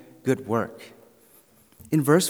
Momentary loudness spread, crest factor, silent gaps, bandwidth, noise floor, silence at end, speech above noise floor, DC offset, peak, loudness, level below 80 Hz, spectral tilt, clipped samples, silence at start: 22 LU; 22 dB; none; over 20 kHz; -57 dBFS; 0 s; 34 dB; under 0.1%; -4 dBFS; -26 LUFS; -68 dBFS; -5.5 dB/octave; under 0.1%; 0.25 s